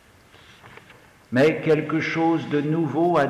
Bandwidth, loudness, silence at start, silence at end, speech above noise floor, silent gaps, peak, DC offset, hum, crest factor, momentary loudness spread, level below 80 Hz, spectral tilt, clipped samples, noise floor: 12 kHz; -22 LUFS; 0.65 s; 0 s; 31 dB; none; -10 dBFS; under 0.1%; none; 12 dB; 4 LU; -60 dBFS; -7.5 dB/octave; under 0.1%; -51 dBFS